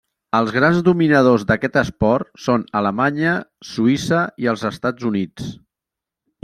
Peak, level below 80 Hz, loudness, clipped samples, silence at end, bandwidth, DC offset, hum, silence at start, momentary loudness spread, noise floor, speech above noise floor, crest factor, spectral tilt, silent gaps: -2 dBFS; -48 dBFS; -18 LUFS; under 0.1%; 0.9 s; 13.5 kHz; under 0.1%; none; 0.35 s; 9 LU; -86 dBFS; 68 dB; 16 dB; -6.5 dB/octave; none